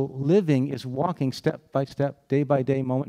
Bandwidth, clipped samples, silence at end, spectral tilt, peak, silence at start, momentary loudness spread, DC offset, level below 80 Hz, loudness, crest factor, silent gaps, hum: 12.5 kHz; under 0.1%; 0 s; -8 dB/octave; -8 dBFS; 0 s; 8 LU; under 0.1%; -66 dBFS; -25 LUFS; 16 dB; none; none